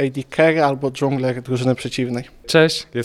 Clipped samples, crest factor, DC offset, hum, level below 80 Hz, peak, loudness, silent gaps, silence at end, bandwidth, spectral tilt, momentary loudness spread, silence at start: under 0.1%; 18 dB; under 0.1%; none; -52 dBFS; -2 dBFS; -19 LUFS; none; 0 s; 13.5 kHz; -5.5 dB/octave; 8 LU; 0 s